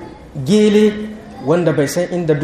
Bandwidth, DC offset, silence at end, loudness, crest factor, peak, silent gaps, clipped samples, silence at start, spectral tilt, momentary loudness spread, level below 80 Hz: 15 kHz; under 0.1%; 0 s; -15 LUFS; 14 dB; -2 dBFS; none; under 0.1%; 0 s; -6 dB/octave; 15 LU; -46 dBFS